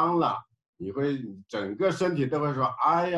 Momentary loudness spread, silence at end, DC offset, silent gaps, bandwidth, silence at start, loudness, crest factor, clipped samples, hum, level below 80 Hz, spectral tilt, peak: 12 LU; 0 s; under 0.1%; 0.68-0.73 s; 11.5 kHz; 0 s; -28 LUFS; 16 dB; under 0.1%; none; -64 dBFS; -7 dB/octave; -12 dBFS